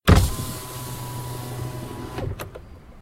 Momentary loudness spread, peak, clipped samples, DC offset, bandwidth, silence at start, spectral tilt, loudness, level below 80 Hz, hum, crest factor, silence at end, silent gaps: 16 LU; 0 dBFS; under 0.1%; under 0.1%; 16 kHz; 0.05 s; -5.5 dB/octave; -28 LUFS; -30 dBFS; none; 24 dB; 0 s; none